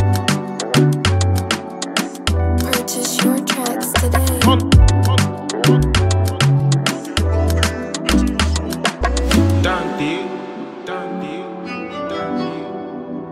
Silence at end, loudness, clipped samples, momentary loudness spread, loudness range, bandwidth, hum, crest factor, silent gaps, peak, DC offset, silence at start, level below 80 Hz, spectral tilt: 0 s; -17 LUFS; under 0.1%; 13 LU; 6 LU; 16 kHz; none; 16 dB; none; 0 dBFS; under 0.1%; 0 s; -24 dBFS; -5 dB/octave